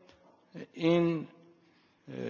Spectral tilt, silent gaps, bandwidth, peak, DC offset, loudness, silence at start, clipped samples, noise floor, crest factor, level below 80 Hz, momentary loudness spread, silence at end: -8 dB/octave; none; 7 kHz; -14 dBFS; under 0.1%; -30 LUFS; 0.55 s; under 0.1%; -66 dBFS; 20 dB; -74 dBFS; 22 LU; 0 s